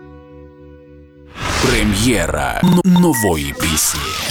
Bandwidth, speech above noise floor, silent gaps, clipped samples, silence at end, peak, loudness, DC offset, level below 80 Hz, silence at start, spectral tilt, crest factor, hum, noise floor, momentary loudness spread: 19 kHz; 26 dB; none; under 0.1%; 0 s; -6 dBFS; -15 LUFS; under 0.1%; -30 dBFS; 0 s; -4.5 dB/octave; 12 dB; none; -41 dBFS; 7 LU